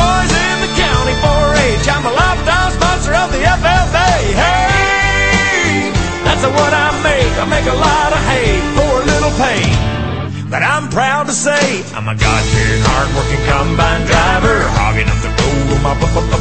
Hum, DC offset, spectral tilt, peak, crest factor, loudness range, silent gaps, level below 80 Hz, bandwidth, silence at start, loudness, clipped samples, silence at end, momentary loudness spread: none; 1%; -4.5 dB/octave; 0 dBFS; 12 dB; 2 LU; none; -20 dBFS; 8.8 kHz; 0 s; -12 LUFS; under 0.1%; 0 s; 4 LU